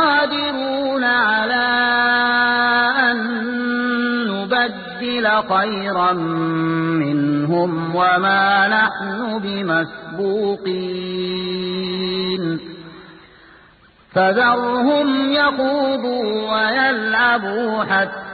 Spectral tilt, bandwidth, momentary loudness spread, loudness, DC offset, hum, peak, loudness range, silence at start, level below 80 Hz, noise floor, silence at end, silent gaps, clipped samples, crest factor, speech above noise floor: -10 dB/octave; 4.8 kHz; 8 LU; -18 LUFS; under 0.1%; none; -4 dBFS; 6 LU; 0 s; -56 dBFS; -50 dBFS; 0 s; none; under 0.1%; 14 dB; 32 dB